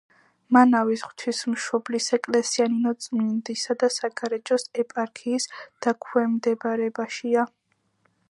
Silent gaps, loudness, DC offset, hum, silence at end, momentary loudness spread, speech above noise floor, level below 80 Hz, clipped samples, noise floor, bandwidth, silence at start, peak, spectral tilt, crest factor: none; -24 LUFS; under 0.1%; none; 0.85 s; 8 LU; 45 dB; -80 dBFS; under 0.1%; -68 dBFS; 11.5 kHz; 0.5 s; -4 dBFS; -3.5 dB/octave; 22 dB